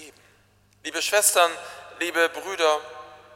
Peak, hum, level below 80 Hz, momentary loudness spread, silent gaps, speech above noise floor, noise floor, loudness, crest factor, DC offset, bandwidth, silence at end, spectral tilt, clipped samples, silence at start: -4 dBFS; none; -70 dBFS; 21 LU; none; 37 dB; -60 dBFS; -22 LUFS; 22 dB; under 0.1%; 16.5 kHz; 0.2 s; 0.5 dB/octave; under 0.1%; 0 s